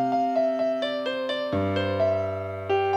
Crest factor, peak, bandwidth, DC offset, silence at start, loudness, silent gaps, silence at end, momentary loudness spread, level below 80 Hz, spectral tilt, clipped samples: 12 dB; -12 dBFS; 8.6 kHz; under 0.1%; 0 s; -26 LUFS; none; 0 s; 4 LU; -68 dBFS; -7 dB/octave; under 0.1%